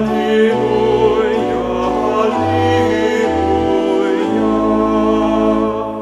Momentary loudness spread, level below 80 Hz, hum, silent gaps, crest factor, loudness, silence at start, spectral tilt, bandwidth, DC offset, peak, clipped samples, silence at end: 3 LU; -36 dBFS; none; none; 14 dB; -15 LUFS; 0 s; -6.5 dB/octave; 12 kHz; under 0.1%; 0 dBFS; under 0.1%; 0 s